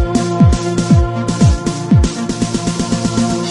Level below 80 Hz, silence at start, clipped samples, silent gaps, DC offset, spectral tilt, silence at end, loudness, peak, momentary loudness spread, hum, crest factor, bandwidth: -22 dBFS; 0 s; under 0.1%; none; under 0.1%; -6 dB/octave; 0 s; -14 LUFS; 0 dBFS; 6 LU; none; 14 dB; 11.5 kHz